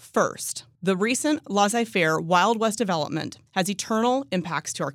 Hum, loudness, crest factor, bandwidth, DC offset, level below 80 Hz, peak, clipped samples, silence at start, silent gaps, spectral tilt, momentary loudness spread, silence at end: none; -24 LUFS; 18 dB; 16.5 kHz; under 0.1%; -72 dBFS; -6 dBFS; under 0.1%; 0.05 s; none; -4 dB/octave; 9 LU; 0 s